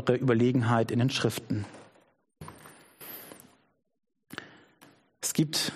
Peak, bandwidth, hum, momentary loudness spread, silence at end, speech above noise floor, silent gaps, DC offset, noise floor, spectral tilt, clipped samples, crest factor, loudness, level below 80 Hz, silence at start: -10 dBFS; 15 kHz; none; 23 LU; 0 s; 35 dB; none; under 0.1%; -62 dBFS; -5 dB/octave; under 0.1%; 22 dB; -27 LUFS; -66 dBFS; 0 s